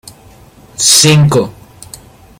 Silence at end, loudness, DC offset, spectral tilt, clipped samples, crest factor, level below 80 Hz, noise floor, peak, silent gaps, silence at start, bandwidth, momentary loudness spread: 0.9 s; -7 LUFS; under 0.1%; -3.5 dB/octave; 0.2%; 12 dB; -44 dBFS; -40 dBFS; 0 dBFS; none; 0.8 s; over 20 kHz; 18 LU